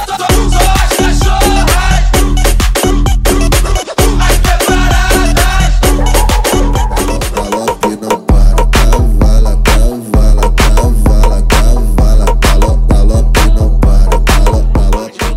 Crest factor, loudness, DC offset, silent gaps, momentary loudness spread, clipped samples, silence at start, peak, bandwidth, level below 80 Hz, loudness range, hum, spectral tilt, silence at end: 8 dB; -11 LUFS; under 0.1%; none; 3 LU; under 0.1%; 0 s; 0 dBFS; 16 kHz; -8 dBFS; 1 LU; none; -4.5 dB/octave; 0 s